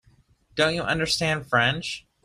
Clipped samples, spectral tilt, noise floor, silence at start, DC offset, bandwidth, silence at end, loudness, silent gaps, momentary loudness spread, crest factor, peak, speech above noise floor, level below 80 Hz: under 0.1%; -3.5 dB/octave; -60 dBFS; 0.55 s; under 0.1%; 15.5 kHz; 0.25 s; -24 LUFS; none; 10 LU; 18 dB; -8 dBFS; 36 dB; -52 dBFS